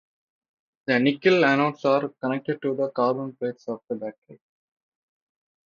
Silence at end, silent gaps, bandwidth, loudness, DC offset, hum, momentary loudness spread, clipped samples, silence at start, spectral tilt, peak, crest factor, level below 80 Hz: 1.35 s; 4.18-4.22 s; 7.2 kHz; -24 LUFS; under 0.1%; none; 14 LU; under 0.1%; 0.9 s; -7 dB/octave; -6 dBFS; 20 dB; -74 dBFS